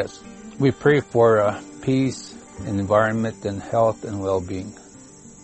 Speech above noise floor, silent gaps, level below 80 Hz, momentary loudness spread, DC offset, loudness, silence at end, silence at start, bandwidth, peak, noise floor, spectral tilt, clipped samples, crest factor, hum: 24 dB; none; -52 dBFS; 18 LU; under 0.1%; -21 LUFS; 0.1 s; 0 s; 8.8 kHz; -4 dBFS; -44 dBFS; -6.5 dB/octave; under 0.1%; 18 dB; none